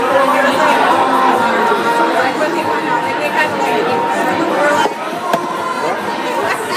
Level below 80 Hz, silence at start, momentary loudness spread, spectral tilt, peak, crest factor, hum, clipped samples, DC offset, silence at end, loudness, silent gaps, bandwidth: -62 dBFS; 0 s; 6 LU; -4 dB/octave; 0 dBFS; 14 dB; none; under 0.1%; under 0.1%; 0 s; -14 LUFS; none; 15.5 kHz